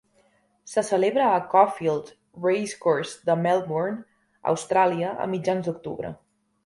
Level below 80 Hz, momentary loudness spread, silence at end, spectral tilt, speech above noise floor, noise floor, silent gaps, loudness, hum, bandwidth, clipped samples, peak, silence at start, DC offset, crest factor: -66 dBFS; 11 LU; 0.5 s; -5.5 dB/octave; 41 dB; -64 dBFS; none; -24 LUFS; none; 11.5 kHz; under 0.1%; -4 dBFS; 0.65 s; under 0.1%; 20 dB